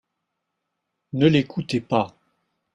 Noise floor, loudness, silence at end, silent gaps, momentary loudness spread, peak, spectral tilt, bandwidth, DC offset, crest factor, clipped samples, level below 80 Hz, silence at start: -79 dBFS; -22 LUFS; 0.7 s; none; 12 LU; -4 dBFS; -7 dB/octave; 11 kHz; under 0.1%; 20 dB; under 0.1%; -58 dBFS; 1.15 s